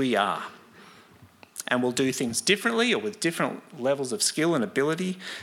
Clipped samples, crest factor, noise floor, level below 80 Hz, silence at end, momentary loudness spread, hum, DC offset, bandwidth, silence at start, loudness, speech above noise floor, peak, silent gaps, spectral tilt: under 0.1%; 20 dB; -53 dBFS; -74 dBFS; 0 s; 9 LU; none; under 0.1%; 17 kHz; 0 s; -26 LUFS; 27 dB; -6 dBFS; none; -3.5 dB/octave